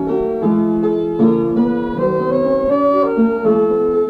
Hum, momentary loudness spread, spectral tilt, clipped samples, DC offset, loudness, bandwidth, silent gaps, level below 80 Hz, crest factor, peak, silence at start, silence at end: none; 3 LU; -10 dB/octave; under 0.1%; under 0.1%; -16 LUFS; 4.9 kHz; none; -42 dBFS; 12 dB; -2 dBFS; 0 s; 0 s